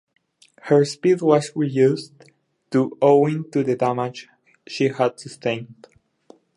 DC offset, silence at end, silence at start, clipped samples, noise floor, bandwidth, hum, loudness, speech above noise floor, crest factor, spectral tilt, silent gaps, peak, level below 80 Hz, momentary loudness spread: under 0.1%; 0.85 s; 0.65 s; under 0.1%; -53 dBFS; 11.5 kHz; none; -20 LUFS; 33 dB; 20 dB; -6.5 dB/octave; none; -2 dBFS; -70 dBFS; 13 LU